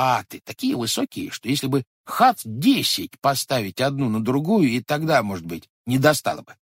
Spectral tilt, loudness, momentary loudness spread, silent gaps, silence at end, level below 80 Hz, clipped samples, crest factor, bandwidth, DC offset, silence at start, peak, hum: -4.5 dB/octave; -22 LUFS; 11 LU; 1.87-2.04 s, 5.70-5.85 s; 0.2 s; -60 dBFS; under 0.1%; 20 dB; 16.5 kHz; under 0.1%; 0 s; -2 dBFS; none